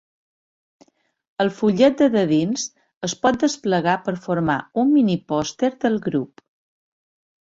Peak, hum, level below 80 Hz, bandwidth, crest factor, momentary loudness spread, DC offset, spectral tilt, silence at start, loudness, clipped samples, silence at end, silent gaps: -2 dBFS; none; -58 dBFS; 8 kHz; 18 dB; 10 LU; under 0.1%; -5.5 dB/octave; 1.4 s; -20 LUFS; under 0.1%; 1.15 s; 2.96-3.01 s